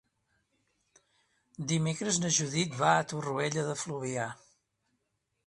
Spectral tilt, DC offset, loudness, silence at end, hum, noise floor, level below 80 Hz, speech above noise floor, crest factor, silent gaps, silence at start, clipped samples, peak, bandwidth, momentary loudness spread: -3.5 dB/octave; under 0.1%; -31 LUFS; 1.1 s; none; -80 dBFS; -70 dBFS; 50 dB; 24 dB; none; 1.6 s; under 0.1%; -10 dBFS; 11.5 kHz; 9 LU